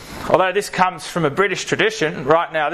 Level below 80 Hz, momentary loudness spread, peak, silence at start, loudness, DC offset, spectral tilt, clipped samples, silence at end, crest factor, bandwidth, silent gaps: -48 dBFS; 4 LU; 0 dBFS; 0 s; -18 LUFS; under 0.1%; -4 dB/octave; under 0.1%; 0 s; 18 dB; 14 kHz; none